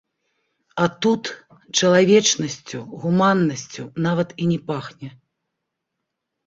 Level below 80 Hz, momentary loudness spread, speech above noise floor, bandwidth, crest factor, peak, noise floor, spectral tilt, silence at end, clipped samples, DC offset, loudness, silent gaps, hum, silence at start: -62 dBFS; 18 LU; 60 dB; 7.8 kHz; 18 dB; -2 dBFS; -80 dBFS; -4.5 dB/octave; 1.4 s; under 0.1%; under 0.1%; -20 LUFS; none; none; 0.75 s